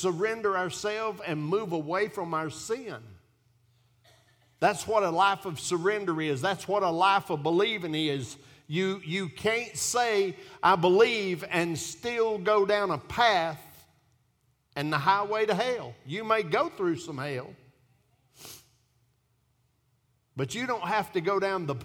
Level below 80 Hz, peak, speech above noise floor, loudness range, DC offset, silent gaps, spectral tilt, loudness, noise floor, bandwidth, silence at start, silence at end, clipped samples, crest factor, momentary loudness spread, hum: -66 dBFS; -8 dBFS; 43 dB; 9 LU; under 0.1%; none; -4 dB/octave; -28 LUFS; -71 dBFS; 18 kHz; 0 s; 0 s; under 0.1%; 20 dB; 11 LU; none